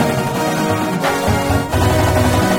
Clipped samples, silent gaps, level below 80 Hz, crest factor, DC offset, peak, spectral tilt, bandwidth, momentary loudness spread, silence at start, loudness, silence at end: under 0.1%; none; -28 dBFS; 14 dB; under 0.1%; -2 dBFS; -5.5 dB/octave; 17 kHz; 3 LU; 0 s; -16 LUFS; 0 s